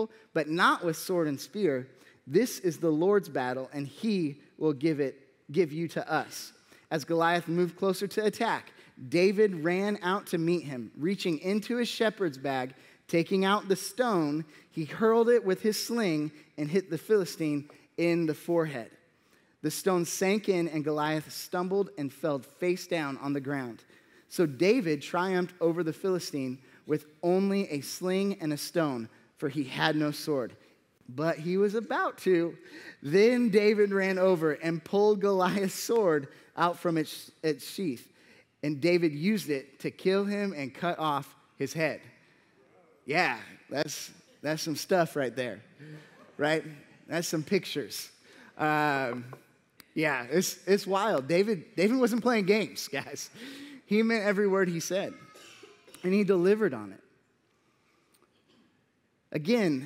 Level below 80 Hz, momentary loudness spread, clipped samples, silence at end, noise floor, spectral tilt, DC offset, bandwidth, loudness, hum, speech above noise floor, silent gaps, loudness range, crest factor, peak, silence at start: -82 dBFS; 13 LU; under 0.1%; 0 s; -72 dBFS; -5 dB/octave; under 0.1%; 16 kHz; -29 LUFS; none; 43 dB; none; 5 LU; 22 dB; -8 dBFS; 0 s